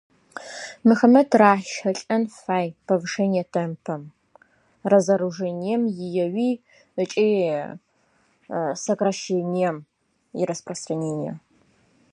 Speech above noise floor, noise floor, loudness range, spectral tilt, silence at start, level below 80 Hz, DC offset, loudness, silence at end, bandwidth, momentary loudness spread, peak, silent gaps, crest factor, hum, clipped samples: 42 dB; -64 dBFS; 7 LU; -6 dB/octave; 0.35 s; -72 dBFS; under 0.1%; -23 LUFS; 0.75 s; 10.5 kHz; 17 LU; -2 dBFS; none; 22 dB; none; under 0.1%